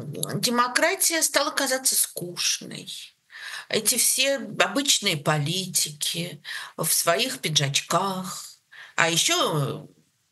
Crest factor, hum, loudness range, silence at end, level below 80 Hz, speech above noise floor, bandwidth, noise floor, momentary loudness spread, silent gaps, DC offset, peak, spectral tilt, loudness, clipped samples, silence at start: 24 dB; none; 2 LU; 0.45 s; -76 dBFS; 23 dB; 13 kHz; -48 dBFS; 16 LU; none; under 0.1%; 0 dBFS; -2 dB/octave; -22 LUFS; under 0.1%; 0 s